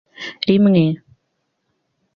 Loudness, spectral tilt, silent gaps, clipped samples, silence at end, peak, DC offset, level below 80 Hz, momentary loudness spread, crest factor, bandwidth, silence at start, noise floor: -16 LUFS; -8.5 dB/octave; none; under 0.1%; 1.2 s; -2 dBFS; under 0.1%; -58 dBFS; 17 LU; 16 dB; 6.4 kHz; 0.2 s; -71 dBFS